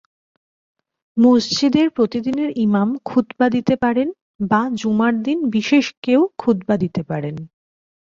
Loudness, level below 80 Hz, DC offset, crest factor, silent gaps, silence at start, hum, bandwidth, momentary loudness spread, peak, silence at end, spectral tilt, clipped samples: -18 LUFS; -56 dBFS; under 0.1%; 16 dB; 4.22-4.39 s, 5.97-6.02 s; 1.15 s; none; 7.6 kHz; 9 LU; -2 dBFS; 0.75 s; -6 dB/octave; under 0.1%